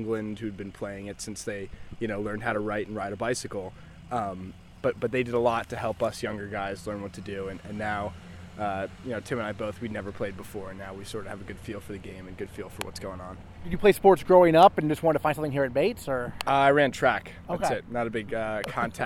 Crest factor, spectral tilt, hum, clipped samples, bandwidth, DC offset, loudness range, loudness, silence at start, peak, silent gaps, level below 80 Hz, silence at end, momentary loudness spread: 22 dB; -5.5 dB/octave; none; under 0.1%; 16 kHz; under 0.1%; 13 LU; -27 LUFS; 0 s; -4 dBFS; none; -52 dBFS; 0 s; 18 LU